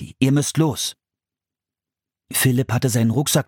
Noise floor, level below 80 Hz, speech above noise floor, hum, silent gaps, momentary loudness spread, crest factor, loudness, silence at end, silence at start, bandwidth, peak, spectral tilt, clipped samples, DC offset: -89 dBFS; -56 dBFS; 70 dB; none; none; 7 LU; 20 dB; -20 LUFS; 0.05 s; 0 s; 17.5 kHz; -2 dBFS; -5 dB/octave; under 0.1%; under 0.1%